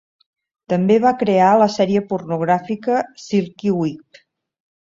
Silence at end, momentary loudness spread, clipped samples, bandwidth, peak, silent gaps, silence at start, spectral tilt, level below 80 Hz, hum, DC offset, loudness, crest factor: 0.9 s; 9 LU; under 0.1%; 7.6 kHz; -2 dBFS; none; 0.7 s; -7 dB/octave; -60 dBFS; none; under 0.1%; -18 LUFS; 16 dB